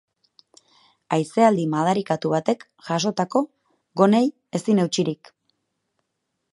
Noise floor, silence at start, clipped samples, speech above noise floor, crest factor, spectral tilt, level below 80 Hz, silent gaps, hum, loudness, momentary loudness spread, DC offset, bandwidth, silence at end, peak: -78 dBFS; 1.1 s; under 0.1%; 57 dB; 22 dB; -6 dB/octave; -72 dBFS; none; none; -22 LUFS; 10 LU; under 0.1%; 11.5 kHz; 1.4 s; -2 dBFS